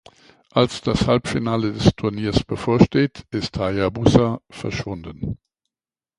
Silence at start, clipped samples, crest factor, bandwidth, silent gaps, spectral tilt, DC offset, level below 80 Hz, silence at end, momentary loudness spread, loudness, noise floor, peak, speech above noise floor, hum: 0.55 s; under 0.1%; 20 dB; 11.5 kHz; none; -6.5 dB/octave; under 0.1%; -38 dBFS; 0.8 s; 13 LU; -21 LUFS; under -90 dBFS; 0 dBFS; over 70 dB; none